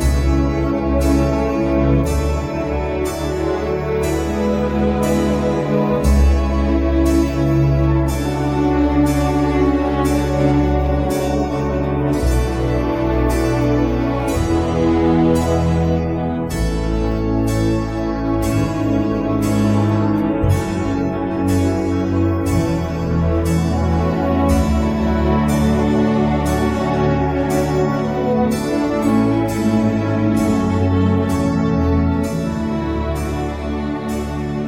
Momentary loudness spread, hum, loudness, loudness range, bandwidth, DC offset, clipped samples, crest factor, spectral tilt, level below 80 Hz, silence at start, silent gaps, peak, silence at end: 5 LU; none; -18 LUFS; 2 LU; 16.5 kHz; under 0.1%; under 0.1%; 14 dB; -7.5 dB/octave; -24 dBFS; 0 s; none; -2 dBFS; 0 s